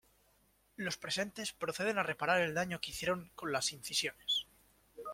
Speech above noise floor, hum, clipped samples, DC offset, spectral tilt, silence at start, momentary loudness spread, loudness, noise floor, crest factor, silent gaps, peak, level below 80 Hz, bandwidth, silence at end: 35 dB; none; under 0.1%; under 0.1%; -2.5 dB/octave; 0.8 s; 8 LU; -36 LUFS; -72 dBFS; 20 dB; none; -18 dBFS; -68 dBFS; 16.5 kHz; 0 s